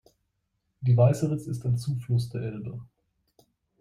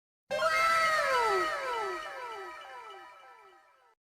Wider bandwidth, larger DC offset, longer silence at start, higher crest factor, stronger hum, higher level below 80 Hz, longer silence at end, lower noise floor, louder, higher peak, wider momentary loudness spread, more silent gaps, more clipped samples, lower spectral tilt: second, 12.5 kHz vs 15.5 kHz; neither; first, 0.8 s vs 0.3 s; about the same, 20 dB vs 18 dB; neither; first, -58 dBFS vs -68 dBFS; first, 0.95 s vs 0.5 s; first, -77 dBFS vs -61 dBFS; about the same, -27 LUFS vs -29 LUFS; first, -8 dBFS vs -16 dBFS; second, 16 LU vs 20 LU; neither; neither; first, -8 dB/octave vs -1.5 dB/octave